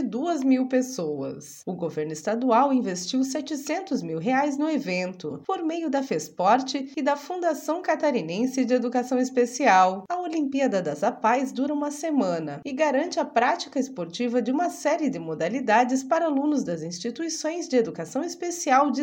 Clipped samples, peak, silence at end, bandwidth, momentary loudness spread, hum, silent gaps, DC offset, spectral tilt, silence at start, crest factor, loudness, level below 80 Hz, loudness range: under 0.1%; -6 dBFS; 0 s; 17 kHz; 9 LU; none; none; under 0.1%; -4.5 dB/octave; 0 s; 18 dB; -25 LUFS; -76 dBFS; 3 LU